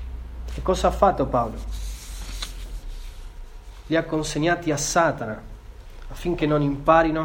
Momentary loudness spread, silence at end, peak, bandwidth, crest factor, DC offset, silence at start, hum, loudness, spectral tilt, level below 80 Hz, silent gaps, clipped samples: 23 LU; 0 s; -2 dBFS; 18 kHz; 22 dB; under 0.1%; 0 s; none; -23 LUFS; -5 dB/octave; -34 dBFS; none; under 0.1%